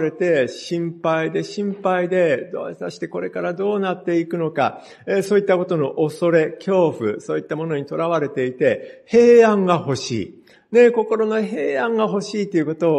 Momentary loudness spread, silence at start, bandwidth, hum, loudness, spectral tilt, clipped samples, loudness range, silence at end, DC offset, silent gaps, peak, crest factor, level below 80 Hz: 11 LU; 0 s; 10.5 kHz; none; -19 LUFS; -6.5 dB/octave; under 0.1%; 5 LU; 0 s; under 0.1%; none; -2 dBFS; 18 dB; -64 dBFS